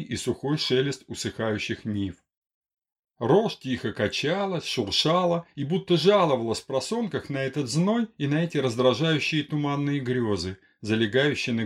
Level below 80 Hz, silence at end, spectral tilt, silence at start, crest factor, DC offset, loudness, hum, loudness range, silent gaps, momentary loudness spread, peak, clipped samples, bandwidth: -60 dBFS; 0 s; -5.5 dB/octave; 0 s; 18 dB; under 0.1%; -25 LUFS; none; 4 LU; 2.37-2.42 s, 2.54-2.61 s, 2.99-3.03 s; 8 LU; -8 dBFS; under 0.1%; 13.5 kHz